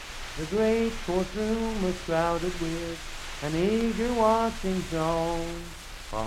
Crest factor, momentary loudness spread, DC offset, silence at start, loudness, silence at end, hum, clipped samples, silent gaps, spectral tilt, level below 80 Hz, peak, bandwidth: 18 dB; 12 LU; under 0.1%; 0 s; -28 LUFS; 0 s; none; under 0.1%; none; -5.5 dB/octave; -40 dBFS; -10 dBFS; 16 kHz